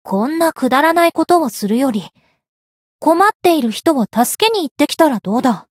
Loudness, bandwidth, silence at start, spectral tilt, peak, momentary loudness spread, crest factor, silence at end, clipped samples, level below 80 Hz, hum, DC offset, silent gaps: -15 LUFS; 16.5 kHz; 0.05 s; -4 dB/octave; 0 dBFS; 5 LU; 14 dB; 0.15 s; under 0.1%; -62 dBFS; none; under 0.1%; 2.49-2.99 s, 3.35-3.40 s, 4.71-4.76 s